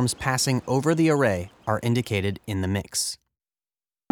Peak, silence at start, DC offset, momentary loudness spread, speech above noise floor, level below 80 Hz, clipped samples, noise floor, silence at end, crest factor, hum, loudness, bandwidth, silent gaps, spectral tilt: -6 dBFS; 0 s; under 0.1%; 8 LU; over 66 dB; -56 dBFS; under 0.1%; under -90 dBFS; 0.95 s; 18 dB; none; -24 LUFS; 20 kHz; none; -5 dB/octave